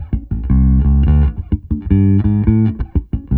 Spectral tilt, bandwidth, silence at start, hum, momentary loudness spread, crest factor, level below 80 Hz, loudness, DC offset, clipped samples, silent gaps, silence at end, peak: -13 dB/octave; 3 kHz; 0 s; none; 9 LU; 14 dB; -18 dBFS; -15 LUFS; under 0.1%; under 0.1%; none; 0 s; 0 dBFS